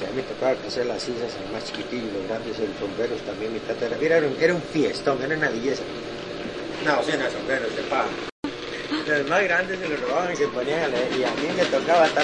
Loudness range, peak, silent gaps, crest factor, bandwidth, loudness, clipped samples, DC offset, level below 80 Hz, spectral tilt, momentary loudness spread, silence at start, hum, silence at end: 4 LU; -6 dBFS; 8.32-8.43 s; 20 dB; 10.5 kHz; -25 LUFS; under 0.1%; under 0.1%; -54 dBFS; -4.5 dB/octave; 10 LU; 0 s; none; 0 s